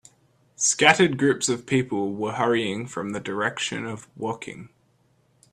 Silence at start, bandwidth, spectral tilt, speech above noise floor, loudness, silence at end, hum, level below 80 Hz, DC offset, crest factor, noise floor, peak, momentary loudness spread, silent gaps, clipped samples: 0.6 s; 13.5 kHz; -3.5 dB/octave; 40 dB; -23 LUFS; 0.85 s; none; -64 dBFS; under 0.1%; 24 dB; -64 dBFS; 0 dBFS; 16 LU; none; under 0.1%